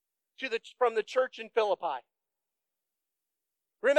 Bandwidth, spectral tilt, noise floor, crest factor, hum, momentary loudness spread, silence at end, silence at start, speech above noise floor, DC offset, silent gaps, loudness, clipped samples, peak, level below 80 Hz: 9 kHz; -2.5 dB/octave; -89 dBFS; 22 dB; none; 8 LU; 0 s; 0.4 s; 58 dB; under 0.1%; none; -32 LUFS; under 0.1%; -12 dBFS; under -90 dBFS